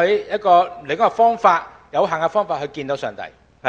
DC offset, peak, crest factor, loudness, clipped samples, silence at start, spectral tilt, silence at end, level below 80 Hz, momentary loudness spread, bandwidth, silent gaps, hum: under 0.1%; 0 dBFS; 18 dB; -18 LUFS; under 0.1%; 0 s; -5 dB/octave; 0 s; -58 dBFS; 10 LU; 7.8 kHz; none; none